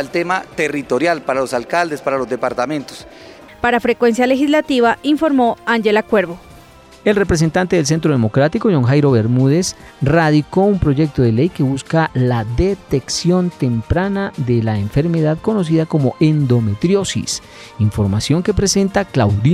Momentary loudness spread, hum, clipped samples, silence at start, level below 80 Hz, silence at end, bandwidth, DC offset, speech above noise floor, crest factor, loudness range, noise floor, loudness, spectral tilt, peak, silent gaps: 6 LU; none; under 0.1%; 0 s; -36 dBFS; 0 s; 14.5 kHz; under 0.1%; 26 dB; 12 dB; 3 LU; -42 dBFS; -16 LUFS; -6 dB/octave; -4 dBFS; none